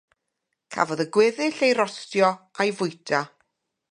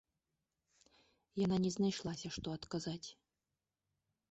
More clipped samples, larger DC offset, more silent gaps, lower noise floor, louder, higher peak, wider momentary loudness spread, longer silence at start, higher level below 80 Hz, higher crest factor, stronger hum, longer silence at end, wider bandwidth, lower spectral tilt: neither; neither; neither; second, -80 dBFS vs under -90 dBFS; first, -23 LUFS vs -40 LUFS; first, -6 dBFS vs -26 dBFS; second, 7 LU vs 13 LU; second, 0.7 s vs 1.35 s; second, -76 dBFS vs -68 dBFS; about the same, 20 dB vs 16 dB; neither; second, 0.65 s vs 1.2 s; first, 11 kHz vs 8 kHz; second, -4.5 dB/octave vs -6 dB/octave